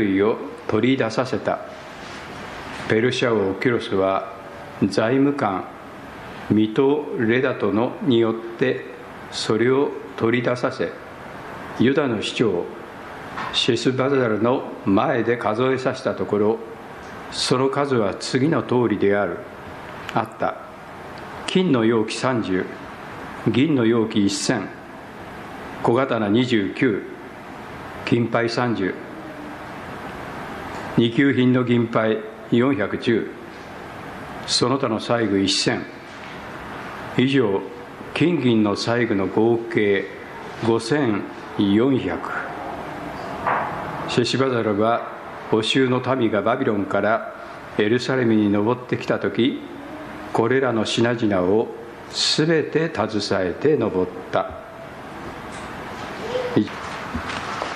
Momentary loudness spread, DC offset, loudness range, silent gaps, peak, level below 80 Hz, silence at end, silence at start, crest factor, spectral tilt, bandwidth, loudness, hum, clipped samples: 16 LU; under 0.1%; 3 LU; none; -4 dBFS; -52 dBFS; 0 s; 0 s; 18 dB; -5.5 dB/octave; 13.5 kHz; -21 LUFS; none; under 0.1%